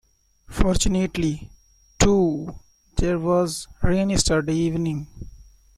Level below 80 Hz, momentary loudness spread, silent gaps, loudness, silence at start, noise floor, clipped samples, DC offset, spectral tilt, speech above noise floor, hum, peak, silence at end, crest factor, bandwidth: -32 dBFS; 14 LU; none; -22 LUFS; 0.5 s; -49 dBFS; under 0.1%; under 0.1%; -5 dB/octave; 28 dB; none; -2 dBFS; 0.5 s; 20 dB; 14.5 kHz